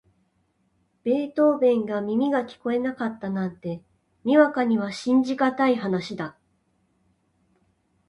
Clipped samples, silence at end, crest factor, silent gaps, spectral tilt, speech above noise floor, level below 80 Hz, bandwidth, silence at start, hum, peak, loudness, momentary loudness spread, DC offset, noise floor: under 0.1%; 1.8 s; 20 dB; none; -7 dB/octave; 46 dB; -68 dBFS; 11 kHz; 1.05 s; none; -6 dBFS; -24 LUFS; 14 LU; under 0.1%; -69 dBFS